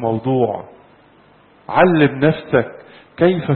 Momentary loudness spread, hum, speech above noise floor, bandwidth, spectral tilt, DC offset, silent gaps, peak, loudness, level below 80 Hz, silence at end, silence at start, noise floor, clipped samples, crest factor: 8 LU; 50 Hz at -40 dBFS; 34 dB; 4.3 kHz; -12.5 dB/octave; under 0.1%; none; 0 dBFS; -16 LUFS; -52 dBFS; 0 s; 0 s; -50 dBFS; under 0.1%; 18 dB